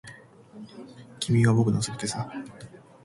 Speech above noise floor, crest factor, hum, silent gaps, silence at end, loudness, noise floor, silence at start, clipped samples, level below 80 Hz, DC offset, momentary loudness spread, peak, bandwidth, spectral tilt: 22 dB; 20 dB; none; none; 0.4 s; -25 LUFS; -49 dBFS; 0.05 s; under 0.1%; -56 dBFS; under 0.1%; 25 LU; -8 dBFS; 11.5 kHz; -5.5 dB/octave